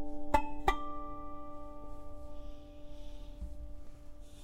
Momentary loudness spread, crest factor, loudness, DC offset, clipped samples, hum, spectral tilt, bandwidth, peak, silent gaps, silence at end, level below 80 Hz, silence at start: 20 LU; 24 dB; -40 LUFS; under 0.1%; under 0.1%; none; -5.5 dB/octave; 15.5 kHz; -12 dBFS; none; 0 s; -46 dBFS; 0 s